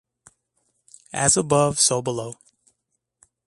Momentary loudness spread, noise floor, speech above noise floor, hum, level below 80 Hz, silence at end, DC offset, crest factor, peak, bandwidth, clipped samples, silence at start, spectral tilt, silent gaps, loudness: 15 LU; -77 dBFS; 56 dB; none; -56 dBFS; 1.15 s; under 0.1%; 24 dB; 0 dBFS; 11.5 kHz; under 0.1%; 1.15 s; -3 dB/octave; none; -20 LUFS